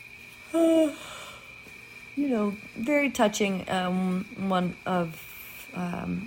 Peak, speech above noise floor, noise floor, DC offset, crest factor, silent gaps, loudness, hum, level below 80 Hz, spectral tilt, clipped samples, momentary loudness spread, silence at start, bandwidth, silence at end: -10 dBFS; 20 dB; -47 dBFS; under 0.1%; 18 dB; none; -27 LUFS; none; -60 dBFS; -5.5 dB/octave; under 0.1%; 20 LU; 0 s; 17 kHz; 0 s